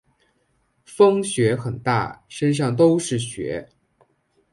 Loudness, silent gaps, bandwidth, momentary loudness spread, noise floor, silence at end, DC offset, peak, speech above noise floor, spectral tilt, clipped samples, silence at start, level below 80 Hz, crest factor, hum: -21 LUFS; none; 11.5 kHz; 13 LU; -66 dBFS; 0.9 s; under 0.1%; -4 dBFS; 47 dB; -6 dB/octave; under 0.1%; 0.9 s; -56 dBFS; 18 dB; none